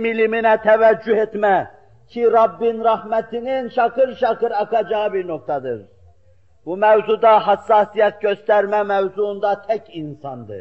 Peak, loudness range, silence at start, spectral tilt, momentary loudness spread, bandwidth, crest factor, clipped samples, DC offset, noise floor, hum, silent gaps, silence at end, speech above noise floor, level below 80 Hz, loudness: -4 dBFS; 4 LU; 0 s; -7 dB/octave; 15 LU; 6 kHz; 14 dB; under 0.1%; 0.2%; -56 dBFS; none; none; 0 s; 39 dB; -60 dBFS; -18 LUFS